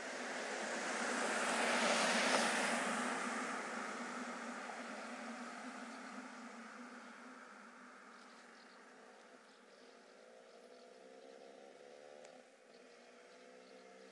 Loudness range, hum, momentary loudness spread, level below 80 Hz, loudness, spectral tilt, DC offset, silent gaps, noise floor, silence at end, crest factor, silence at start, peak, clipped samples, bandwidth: 23 LU; none; 26 LU; under -90 dBFS; -39 LUFS; -1.5 dB/octave; under 0.1%; none; -62 dBFS; 0 s; 22 dB; 0 s; -20 dBFS; under 0.1%; 11.5 kHz